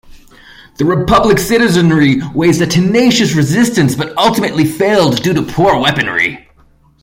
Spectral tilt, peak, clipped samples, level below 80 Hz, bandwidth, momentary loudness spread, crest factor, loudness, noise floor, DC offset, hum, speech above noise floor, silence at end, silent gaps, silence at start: -5 dB/octave; 0 dBFS; under 0.1%; -38 dBFS; 16.5 kHz; 5 LU; 12 dB; -11 LUFS; -48 dBFS; under 0.1%; none; 37 dB; 0.65 s; none; 0.05 s